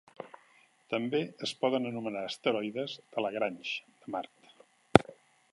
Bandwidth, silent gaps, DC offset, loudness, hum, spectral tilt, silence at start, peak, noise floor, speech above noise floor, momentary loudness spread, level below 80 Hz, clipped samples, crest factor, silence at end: 11.5 kHz; none; under 0.1%; -32 LUFS; none; -5.5 dB/octave; 0.2 s; 0 dBFS; -64 dBFS; 31 dB; 20 LU; -60 dBFS; under 0.1%; 32 dB; 0.4 s